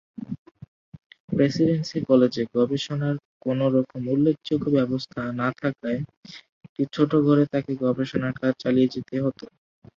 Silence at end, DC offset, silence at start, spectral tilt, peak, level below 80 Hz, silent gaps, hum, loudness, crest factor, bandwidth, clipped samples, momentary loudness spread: 0.5 s; under 0.1%; 0.2 s; -7.5 dB/octave; -6 dBFS; -60 dBFS; 0.39-0.46 s, 0.68-0.92 s, 1.06-1.10 s, 1.20-1.28 s, 3.25-3.40 s, 6.17-6.23 s, 6.49-6.61 s, 6.69-6.76 s; none; -24 LUFS; 18 dB; 7.4 kHz; under 0.1%; 17 LU